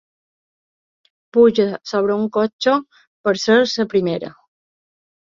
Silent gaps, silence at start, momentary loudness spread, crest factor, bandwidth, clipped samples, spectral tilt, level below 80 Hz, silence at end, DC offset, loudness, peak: 2.53-2.59 s, 3.07-3.24 s; 1.35 s; 9 LU; 18 dB; 7.4 kHz; under 0.1%; -5 dB/octave; -62 dBFS; 0.95 s; under 0.1%; -18 LUFS; -2 dBFS